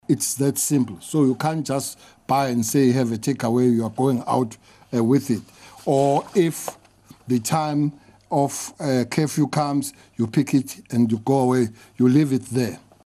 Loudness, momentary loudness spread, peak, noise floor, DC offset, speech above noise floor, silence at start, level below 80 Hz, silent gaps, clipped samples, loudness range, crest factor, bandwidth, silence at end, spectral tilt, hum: -22 LUFS; 8 LU; -6 dBFS; -46 dBFS; under 0.1%; 26 dB; 0.1 s; -62 dBFS; none; under 0.1%; 2 LU; 16 dB; 14.5 kHz; 0.25 s; -6 dB/octave; none